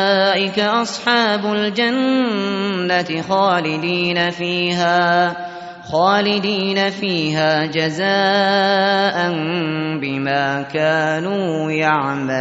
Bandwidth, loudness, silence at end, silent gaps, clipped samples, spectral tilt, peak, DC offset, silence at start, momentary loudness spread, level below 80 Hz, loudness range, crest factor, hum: 8 kHz; -17 LUFS; 0 s; none; under 0.1%; -2.5 dB/octave; -2 dBFS; under 0.1%; 0 s; 6 LU; -60 dBFS; 1 LU; 14 dB; none